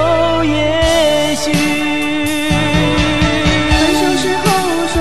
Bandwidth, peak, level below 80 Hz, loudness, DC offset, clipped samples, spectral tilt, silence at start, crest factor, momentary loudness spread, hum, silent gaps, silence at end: 13 kHz; 0 dBFS; -26 dBFS; -13 LUFS; 4%; under 0.1%; -4.5 dB/octave; 0 s; 14 dB; 4 LU; none; none; 0 s